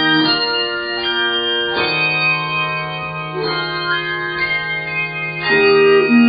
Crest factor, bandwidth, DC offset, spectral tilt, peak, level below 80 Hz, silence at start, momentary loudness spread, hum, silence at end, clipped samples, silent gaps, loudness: 14 dB; 5 kHz; under 0.1%; -1.5 dB/octave; -2 dBFS; -52 dBFS; 0 s; 9 LU; none; 0 s; under 0.1%; none; -16 LUFS